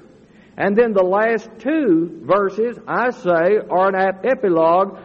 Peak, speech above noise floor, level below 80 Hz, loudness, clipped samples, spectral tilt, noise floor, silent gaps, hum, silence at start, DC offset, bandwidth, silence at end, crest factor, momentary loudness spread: -4 dBFS; 30 dB; -60 dBFS; -18 LUFS; under 0.1%; -8 dB/octave; -47 dBFS; none; none; 0.6 s; under 0.1%; 7 kHz; 0 s; 14 dB; 6 LU